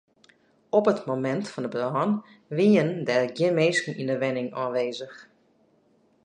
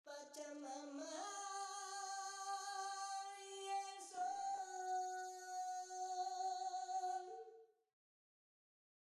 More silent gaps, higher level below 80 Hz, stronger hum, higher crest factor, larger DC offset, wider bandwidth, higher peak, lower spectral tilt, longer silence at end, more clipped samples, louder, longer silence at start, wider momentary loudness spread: neither; first, -76 dBFS vs under -90 dBFS; neither; about the same, 18 dB vs 14 dB; neither; second, 9.8 kHz vs 13.5 kHz; first, -8 dBFS vs -34 dBFS; first, -6 dB/octave vs 1 dB/octave; second, 1 s vs 1.4 s; neither; first, -25 LUFS vs -47 LUFS; first, 0.75 s vs 0.05 s; first, 10 LU vs 7 LU